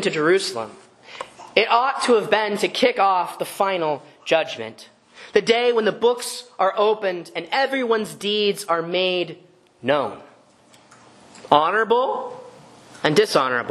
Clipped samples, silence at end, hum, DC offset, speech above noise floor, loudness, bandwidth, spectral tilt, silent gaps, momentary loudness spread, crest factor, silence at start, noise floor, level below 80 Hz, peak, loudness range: under 0.1%; 0 s; none; under 0.1%; 32 dB; -20 LUFS; 13 kHz; -3.5 dB/octave; none; 13 LU; 22 dB; 0 s; -53 dBFS; -70 dBFS; 0 dBFS; 3 LU